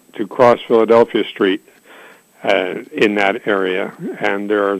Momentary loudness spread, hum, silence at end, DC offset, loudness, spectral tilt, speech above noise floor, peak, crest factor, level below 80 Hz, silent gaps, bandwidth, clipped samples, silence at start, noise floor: 12 LU; none; 0 s; under 0.1%; -16 LUFS; -5.5 dB/octave; 28 dB; -2 dBFS; 14 dB; -58 dBFS; none; 14.5 kHz; under 0.1%; 0.15 s; -43 dBFS